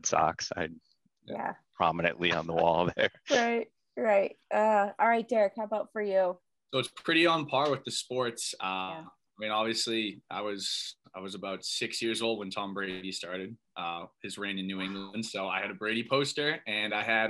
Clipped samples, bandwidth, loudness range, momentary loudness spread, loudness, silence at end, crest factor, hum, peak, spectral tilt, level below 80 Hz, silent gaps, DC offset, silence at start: under 0.1%; 12.5 kHz; 7 LU; 12 LU; -31 LUFS; 0 s; 20 dB; none; -10 dBFS; -3.5 dB/octave; -68 dBFS; none; under 0.1%; 0.05 s